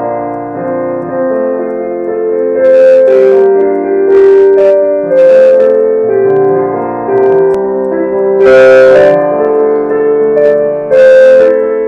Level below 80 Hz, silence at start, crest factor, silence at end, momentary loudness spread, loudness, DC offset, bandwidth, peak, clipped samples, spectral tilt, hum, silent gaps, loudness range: -48 dBFS; 0 s; 6 dB; 0 s; 12 LU; -7 LUFS; under 0.1%; 7 kHz; 0 dBFS; 3%; -7 dB/octave; none; none; 3 LU